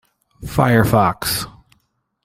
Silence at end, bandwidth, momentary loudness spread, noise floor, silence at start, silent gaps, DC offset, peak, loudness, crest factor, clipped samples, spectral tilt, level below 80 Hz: 0.75 s; 16.5 kHz; 17 LU; -66 dBFS; 0.4 s; none; under 0.1%; -2 dBFS; -17 LUFS; 16 dB; under 0.1%; -5.5 dB/octave; -40 dBFS